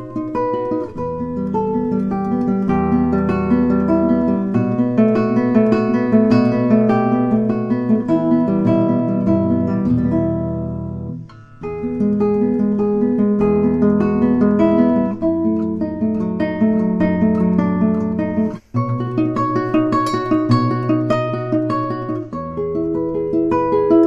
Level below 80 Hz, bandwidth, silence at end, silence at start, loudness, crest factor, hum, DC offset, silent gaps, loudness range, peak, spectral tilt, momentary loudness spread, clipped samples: -42 dBFS; 7.8 kHz; 0 s; 0 s; -17 LUFS; 16 dB; none; under 0.1%; none; 4 LU; -2 dBFS; -9.5 dB/octave; 8 LU; under 0.1%